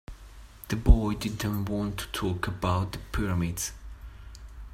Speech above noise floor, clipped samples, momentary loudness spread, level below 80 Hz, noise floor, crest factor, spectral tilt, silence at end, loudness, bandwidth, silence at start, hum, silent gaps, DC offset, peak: 21 dB; under 0.1%; 23 LU; -32 dBFS; -48 dBFS; 22 dB; -5.5 dB/octave; 0 s; -29 LUFS; 16 kHz; 0.1 s; none; none; under 0.1%; -6 dBFS